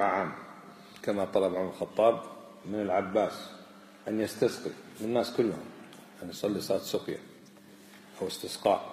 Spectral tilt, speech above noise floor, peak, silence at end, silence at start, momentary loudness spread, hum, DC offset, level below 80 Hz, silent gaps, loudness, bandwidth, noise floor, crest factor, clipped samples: -5 dB/octave; 23 dB; -12 dBFS; 0 s; 0 s; 21 LU; none; under 0.1%; -72 dBFS; none; -31 LUFS; 15 kHz; -54 dBFS; 20 dB; under 0.1%